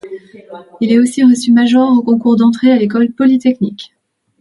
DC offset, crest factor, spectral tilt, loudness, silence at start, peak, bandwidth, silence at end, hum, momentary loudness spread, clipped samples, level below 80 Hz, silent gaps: under 0.1%; 12 dB; -6 dB/octave; -11 LUFS; 0.05 s; 0 dBFS; 11.5 kHz; 0.55 s; none; 11 LU; under 0.1%; -60 dBFS; none